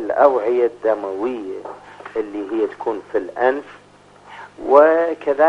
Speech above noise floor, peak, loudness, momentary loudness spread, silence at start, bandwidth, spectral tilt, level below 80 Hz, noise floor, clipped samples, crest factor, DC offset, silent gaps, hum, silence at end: 29 dB; 0 dBFS; -19 LUFS; 18 LU; 0 s; 8 kHz; -6 dB/octave; -62 dBFS; -46 dBFS; under 0.1%; 18 dB; under 0.1%; none; 50 Hz at -55 dBFS; 0 s